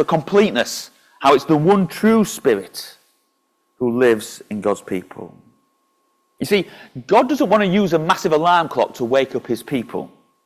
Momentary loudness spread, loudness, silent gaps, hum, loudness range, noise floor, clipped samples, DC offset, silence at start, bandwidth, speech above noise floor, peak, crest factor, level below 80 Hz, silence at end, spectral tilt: 16 LU; -18 LUFS; none; none; 6 LU; -67 dBFS; under 0.1%; under 0.1%; 0 s; 16 kHz; 50 dB; -2 dBFS; 16 dB; -58 dBFS; 0.4 s; -5.5 dB/octave